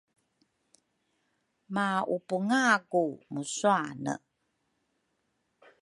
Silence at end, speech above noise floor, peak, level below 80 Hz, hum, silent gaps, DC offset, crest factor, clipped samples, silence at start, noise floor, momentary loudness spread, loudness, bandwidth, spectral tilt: 1.65 s; 49 dB; -10 dBFS; -80 dBFS; none; none; under 0.1%; 22 dB; under 0.1%; 1.7 s; -78 dBFS; 12 LU; -29 LUFS; 11.5 kHz; -4.5 dB/octave